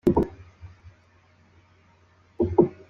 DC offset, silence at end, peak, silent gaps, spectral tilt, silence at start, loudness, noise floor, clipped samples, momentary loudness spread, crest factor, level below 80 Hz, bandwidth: under 0.1%; 0.2 s; -6 dBFS; none; -10 dB/octave; 0.05 s; -25 LUFS; -59 dBFS; under 0.1%; 26 LU; 22 dB; -46 dBFS; 5.6 kHz